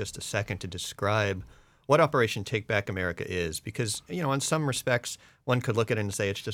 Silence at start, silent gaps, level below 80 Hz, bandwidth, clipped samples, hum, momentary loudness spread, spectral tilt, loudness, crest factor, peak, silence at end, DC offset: 0 s; none; -60 dBFS; 18.5 kHz; under 0.1%; none; 10 LU; -4.5 dB/octave; -29 LUFS; 20 dB; -8 dBFS; 0 s; under 0.1%